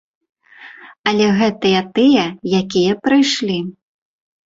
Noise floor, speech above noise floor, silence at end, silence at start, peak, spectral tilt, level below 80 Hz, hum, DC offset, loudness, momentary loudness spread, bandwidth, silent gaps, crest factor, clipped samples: -40 dBFS; 25 dB; 0.8 s; 0.6 s; -2 dBFS; -5 dB/octave; -56 dBFS; none; under 0.1%; -16 LUFS; 8 LU; 7.8 kHz; 0.99-1.04 s; 16 dB; under 0.1%